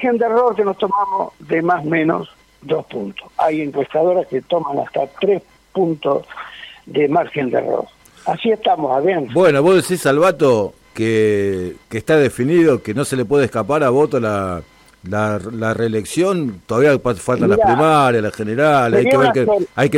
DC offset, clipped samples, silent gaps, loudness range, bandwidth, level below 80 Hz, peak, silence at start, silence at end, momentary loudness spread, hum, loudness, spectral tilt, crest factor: under 0.1%; under 0.1%; none; 5 LU; 16 kHz; -52 dBFS; -4 dBFS; 0 s; 0 s; 11 LU; none; -17 LUFS; -6 dB/octave; 12 dB